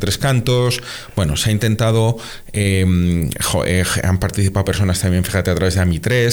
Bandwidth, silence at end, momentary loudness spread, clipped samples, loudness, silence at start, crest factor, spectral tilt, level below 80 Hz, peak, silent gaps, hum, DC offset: over 20 kHz; 0 s; 4 LU; under 0.1%; -17 LUFS; 0 s; 10 dB; -5 dB/octave; -36 dBFS; -6 dBFS; none; none; under 0.1%